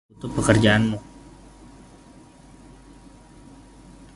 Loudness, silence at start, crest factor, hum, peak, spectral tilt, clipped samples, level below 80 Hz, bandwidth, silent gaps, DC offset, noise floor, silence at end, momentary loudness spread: -20 LUFS; 0.25 s; 24 dB; none; -2 dBFS; -5.5 dB/octave; under 0.1%; -44 dBFS; 11.5 kHz; none; under 0.1%; -48 dBFS; 3.15 s; 14 LU